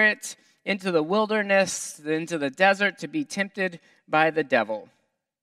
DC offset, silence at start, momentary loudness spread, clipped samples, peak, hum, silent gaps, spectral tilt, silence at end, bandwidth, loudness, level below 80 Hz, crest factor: under 0.1%; 0 s; 10 LU; under 0.1%; -4 dBFS; none; none; -3.5 dB/octave; 0.6 s; 14.5 kHz; -24 LUFS; -76 dBFS; 20 dB